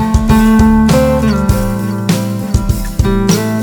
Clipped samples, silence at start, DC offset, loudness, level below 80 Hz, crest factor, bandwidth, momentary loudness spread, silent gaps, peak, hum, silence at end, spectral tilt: under 0.1%; 0 s; under 0.1%; -12 LUFS; -18 dBFS; 10 dB; 20 kHz; 8 LU; none; 0 dBFS; none; 0 s; -6.5 dB/octave